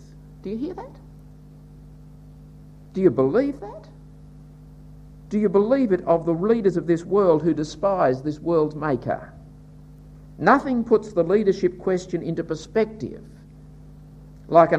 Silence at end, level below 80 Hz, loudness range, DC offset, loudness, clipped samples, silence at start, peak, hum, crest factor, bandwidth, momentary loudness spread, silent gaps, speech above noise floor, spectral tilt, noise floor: 0 s; -48 dBFS; 6 LU; under 0.1%; -22 LUFS; under 0.1%; 0.15 s; -2 dBFS; none; 22 dB; 8.8 kHz; 16 LU; none; 24 dB; -7.5 dB/octave; -45 dBFS